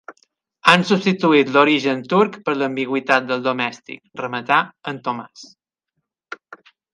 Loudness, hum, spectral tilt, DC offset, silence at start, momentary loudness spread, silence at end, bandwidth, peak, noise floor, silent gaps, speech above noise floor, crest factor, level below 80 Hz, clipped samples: -18 LUFS; none; -5.5 dB/octave; under 0.1%; 0.1 s; 21 LU; 0.4 s; 11.5 kHz; 0 dBFS; -77 dBFS; none; 59 dB; 20 dB; -70 dBFS; under 0.1%